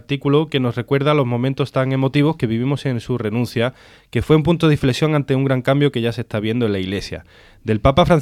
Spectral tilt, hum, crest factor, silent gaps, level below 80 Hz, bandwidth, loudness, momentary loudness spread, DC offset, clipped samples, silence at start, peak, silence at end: -7.5 dB/octave; none; 16 dB; none; -38 dBFS; 14 kHz; -18 LUFS; 8 LU; under 0.1%; under 0.1%; 0.1 s; -2 dBFS; 0 s